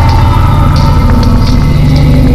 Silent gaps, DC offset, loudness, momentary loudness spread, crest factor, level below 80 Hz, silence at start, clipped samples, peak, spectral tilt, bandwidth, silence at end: none; under 0.1%; -7 LUFS; 2 LU; 6 dB; -10 dBFS; 0 s; under 0.1%; 0 dBFS; -7.5 dB/octave; 14 kHz; 0 s